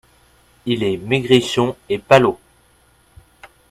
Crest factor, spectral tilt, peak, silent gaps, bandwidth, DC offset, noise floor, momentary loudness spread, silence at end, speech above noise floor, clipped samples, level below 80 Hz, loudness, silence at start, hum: 20 dB; -5.5 dB/octave; 0 dBFS; none; 14 kHz; under 0.1%; -55 dBFS; 12 LU; 0.25 s; 39 dB; under 0.1%; -52 dBFS; -17 LUFS; 0.65 s; none